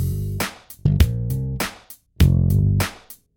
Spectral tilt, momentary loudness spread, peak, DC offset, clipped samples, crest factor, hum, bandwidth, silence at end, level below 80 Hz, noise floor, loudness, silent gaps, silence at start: -6 dB/octave; 10 LU; -2 dBFS; under 0.1%; under 0.1%; 18 dB; none; 17.5 kHz; 0.25 s; -26 dBFS; -45 dBFS; -21 LUFS; none; 0 s